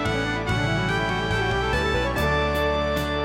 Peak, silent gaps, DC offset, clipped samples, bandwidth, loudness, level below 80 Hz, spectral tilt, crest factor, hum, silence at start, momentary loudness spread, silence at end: -10 dBFS; none; under 0.1%; under 0.1%; 16 kHz; -23 LUFS; -34 dBFS; -5.5 dB/octave; 14 dB; none; 0 s; 2 LU; 0 s